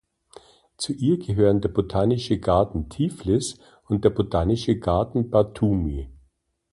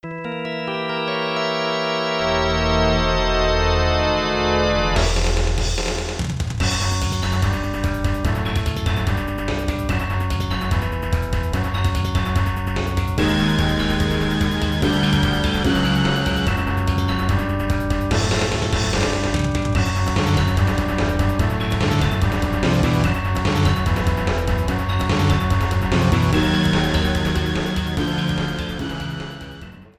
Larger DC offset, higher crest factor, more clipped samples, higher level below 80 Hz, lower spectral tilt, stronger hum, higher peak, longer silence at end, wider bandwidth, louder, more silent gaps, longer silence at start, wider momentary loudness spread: neither; first, 20 dB vs 14 dB; neither; second, -38 dBFS vs -26 dBFS; first, -7 dB/octave vs -5.5 dB/octave; neither; about the same, -4 dBFS vs -4 dBFS; first, 0.6 s vs 0.15 s; second, 11.5 kHz vs 14.5 kHz; second, -23 LUFS vs -20 LUFS; neither; first, 0.8 s vs 0.05 s; first, 9 LU vs 5 LU